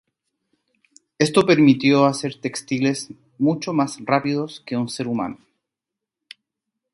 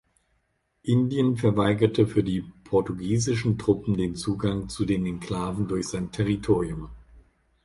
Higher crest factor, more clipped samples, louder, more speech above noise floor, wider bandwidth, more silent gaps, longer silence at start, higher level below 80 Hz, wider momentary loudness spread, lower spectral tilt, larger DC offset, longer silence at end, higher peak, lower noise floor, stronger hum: about the same, 20 dB vs 20 dB; neither; first, -20 LUFS vs -26 LUFS; first, 66 dB vs 48 dB; about the same, 11.5 kHz vs 11.5 kHz; neither; first, 1.2 s vs 0.85 s; second, -62 dBFS vs -46 dBFS; first, 12 LU vs 8 LU; about the same, -5.5 dB/octave vs -6.5 dB/octave; neither; first, 1.6 s vs 0.45 s; first, -2 dBFS vs -6 dBFS; first, -86 dBFS vs -72 dBFS; neither